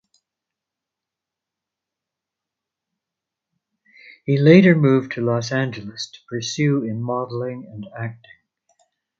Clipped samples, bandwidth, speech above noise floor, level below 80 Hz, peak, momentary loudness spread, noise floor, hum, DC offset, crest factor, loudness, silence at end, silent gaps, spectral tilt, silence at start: under 0.1%; 7.8 kHz; 67 dB; -62 dBFS; 0 dBFS; 20 LU; -86 dBFS; none; under 0.1%; 22 dB; -19 LUFS; 1.05 s; none; -6.5 dB/octave; 4.25 s